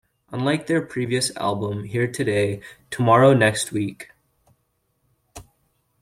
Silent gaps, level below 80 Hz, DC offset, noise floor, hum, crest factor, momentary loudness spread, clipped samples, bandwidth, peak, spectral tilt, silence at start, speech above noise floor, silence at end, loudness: none; -58 dBFS; under 0.1%; -70 dBFS; none; 20 dB; 19 LU; under 0.1%; 16 kHz; -2 dBFS; -5 dB/octave; 0.3 s; 49 dB; 0.6 s; -21 LUFS